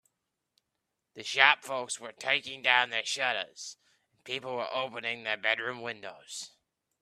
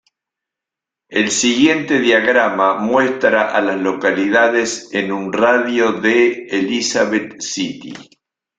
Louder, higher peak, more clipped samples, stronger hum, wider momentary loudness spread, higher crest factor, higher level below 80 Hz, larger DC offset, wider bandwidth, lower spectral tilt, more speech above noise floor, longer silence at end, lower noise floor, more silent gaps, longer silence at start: second, -29 LUFS vs -15 LUFS; about the same, -4 dBFS vs -2 dBFS; neither; neither; first, 19 LU vs 9 LU; first, 30 dB vs 16 dB; second, -82 dBFS vs -60 dBFS; neither; first, 14 kHz vs 9.4 kHz; second, -0.5 dB/octave vs -3 dB/octave; second, 53 dB vs 69 dB; about the same, 0.55 s vs 0.55 s; about the same, -84 dBFS vs -85 dBFS; neither; about the same, 1.15 s vs 1.1 s